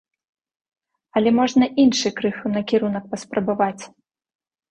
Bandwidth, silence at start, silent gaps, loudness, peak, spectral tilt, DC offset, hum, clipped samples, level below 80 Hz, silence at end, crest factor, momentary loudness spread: 9.4 kHz; 1.15 s; none; -20 LUFS; -6 dBFS; -5 dB/octave; under 0.1%; none; under 0.1%; -60 dBFS; 0.85 s; 16 dB; 9 LU